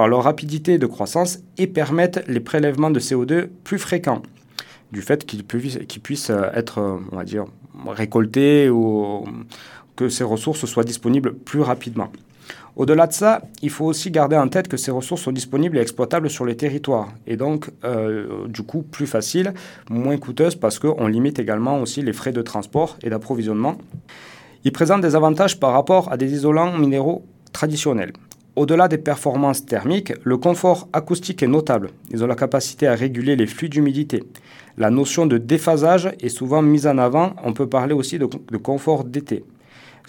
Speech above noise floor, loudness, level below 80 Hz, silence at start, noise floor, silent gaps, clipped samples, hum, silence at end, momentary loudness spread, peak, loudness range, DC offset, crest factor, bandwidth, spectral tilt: 28 dB; -20 LUFS; -64 dBFS; 0 s; -47 dBFS; none; under 0.1%; none; 0.65 s; 13 LU; 0 dBFS; 6 LU; under 0.1%; 20 dB; 18 kHz; -6 dB/octave